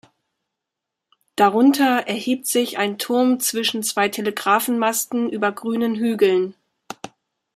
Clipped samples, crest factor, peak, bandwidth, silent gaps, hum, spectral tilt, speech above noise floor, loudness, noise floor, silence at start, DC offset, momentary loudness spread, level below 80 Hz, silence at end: under 0.1%; 20 dB; -2 dBFS; 15.5 kHz; none; none; -3 dB/octave; 64 dB; -20 LUFS; -83 dBFS; 1.4 s; under 0.1%; 14 LU; -72 dBFS; 0.5 s